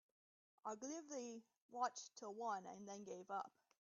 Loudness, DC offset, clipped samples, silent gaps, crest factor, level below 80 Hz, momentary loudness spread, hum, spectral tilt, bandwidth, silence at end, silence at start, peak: -50 LUFS; under 0.1%; under 0.1%; 1.62-1.69 s; 22 dB; under -90 dBFS; 9 LU; none; -3 dB/octave; 7.4 kHz; 0.3 s; 0.65 s; -30 dBFS